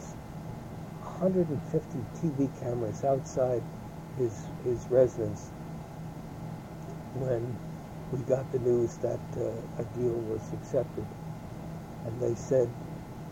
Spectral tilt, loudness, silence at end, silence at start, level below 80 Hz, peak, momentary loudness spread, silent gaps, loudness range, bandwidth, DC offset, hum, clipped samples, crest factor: -8 dB/octave; -33 LUFS; 0 s; 0 s; -54 dBFS; -12 dBFS; 14 LU; none; 4 LU; 16.5 kHz; under 0.1%; none; under 0.1%; 20 dB